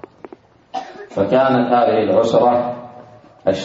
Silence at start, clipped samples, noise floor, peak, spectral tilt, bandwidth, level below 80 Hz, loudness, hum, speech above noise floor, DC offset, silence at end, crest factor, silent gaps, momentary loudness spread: 0.75 s; under 0.1%; -42 dBFS; -2 dBFS; -6.5 dB/octave; 7.8 kHz; -58 dBFS; -16 LUFS; none; 27 dB; under 0.1%; 0 s; 16 dB; none; 16 LU